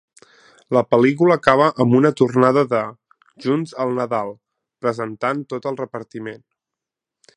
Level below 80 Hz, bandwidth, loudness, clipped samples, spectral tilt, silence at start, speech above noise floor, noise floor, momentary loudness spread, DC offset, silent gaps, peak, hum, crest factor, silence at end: -62 dBFS; 10.5 kHz; -18 LUFS; under 0.1%; -7.5 dB/octave; 0.7 s; 68 dB; -86 dBFS; 15 LU; under 0.1%; none; 0 dBFS; none; 20 dB; 1 s